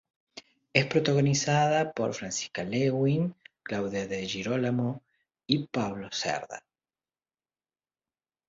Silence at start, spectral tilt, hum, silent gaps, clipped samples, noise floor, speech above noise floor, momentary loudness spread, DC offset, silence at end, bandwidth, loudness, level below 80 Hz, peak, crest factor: 0.35 s; -5 dB/octave; none; none; under 0.1%; under -90 dBFS; over 62 dB; 19 LU; under 0.1%; 1.9 s; 7.8 kHz; -28 LUFS; -64 dBFS; -6 dBFS; 24 dB